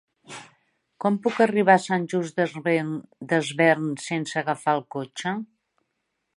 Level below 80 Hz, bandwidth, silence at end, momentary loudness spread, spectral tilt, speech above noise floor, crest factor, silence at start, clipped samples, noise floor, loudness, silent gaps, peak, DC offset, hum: -76 dBFS; 11.5 kHz; 0.9 s; 15 LU; -5.5 dB/octave; 54 dB; 22 dB; 0.3 s; under 0.1%; -78 dBFS; -24 LUFS; none; -2 dBFS; under 0.1%; none